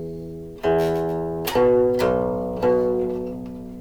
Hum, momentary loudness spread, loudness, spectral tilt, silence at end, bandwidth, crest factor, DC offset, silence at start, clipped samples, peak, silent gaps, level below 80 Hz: none; 15 LU; -22 LUFS; -6.5 dB/octave; 0 s; over 20 kHz; 14 dB; under 0.1%; 0 s; under 0.1%; -8 dBFS; none; -44 dBFS